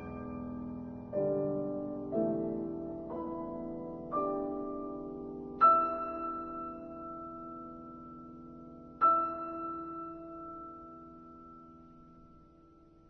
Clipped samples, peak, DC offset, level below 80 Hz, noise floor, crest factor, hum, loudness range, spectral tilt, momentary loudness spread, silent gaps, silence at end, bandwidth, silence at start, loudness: under 0.1%; -14 dBFS; under 0.1%; -62 dBFS; -60 dBFS; 22 dB; none; 10 LU; -8.5 dB/octave; 23 LU; none; 0 s; 4.3 kHz; 0 s; -35 LUFS